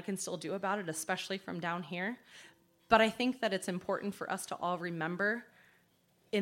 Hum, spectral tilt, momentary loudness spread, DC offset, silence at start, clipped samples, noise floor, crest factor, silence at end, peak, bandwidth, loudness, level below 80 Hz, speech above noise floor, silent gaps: none; -4 dB/octave; 10 LU; under 0.1%; 0 s; under 0.1%; -71 dBFS; 26 dB; 0 s; -10 dBFS; 16.5 kHz; -35 LUFS; -68 dBFS; 36 dB; none